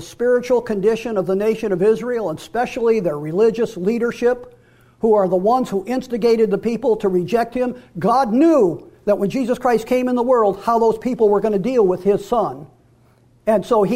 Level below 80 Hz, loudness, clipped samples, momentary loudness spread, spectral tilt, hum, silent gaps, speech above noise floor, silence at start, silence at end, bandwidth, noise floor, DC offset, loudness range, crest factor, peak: -50 dBFS; -18 LUFS; under 0.1%; 7 LU; -7 dB/octave; none; none; 36 dB; 0 s; 0 s; 15.5 kHz; -53 dBFS; under 0.1%; 2 LU; 12 dB; -6 dBFS